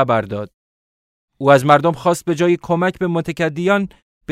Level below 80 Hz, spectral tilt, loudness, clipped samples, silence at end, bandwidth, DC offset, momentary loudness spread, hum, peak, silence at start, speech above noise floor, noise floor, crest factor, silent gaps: -54 dBFS; -6.5 dB/octave; -17 LUFS; under 0.1%; 0 s; 15.5 kHz; under 0.1%; 13 LU; none; 0 dBFS; 0 s; over 74 dB; under -90 dBFS; 18 dB; 0.54-1.28 s, 4.02-4.21 s